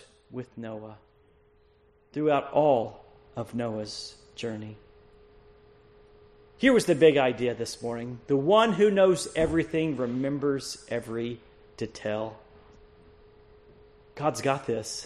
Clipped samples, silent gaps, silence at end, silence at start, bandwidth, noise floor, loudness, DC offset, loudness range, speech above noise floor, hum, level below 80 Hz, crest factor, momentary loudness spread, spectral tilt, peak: under 0.1%; none; 0 s; 0.3 s; 13 kHz; -62 dBFS; -26 LUFS; under 0.1%; 13 LU; 36 dB; none; -56 dBFS; 22 dB; 19 LU; -5.5 dB/octave; -8 dBFS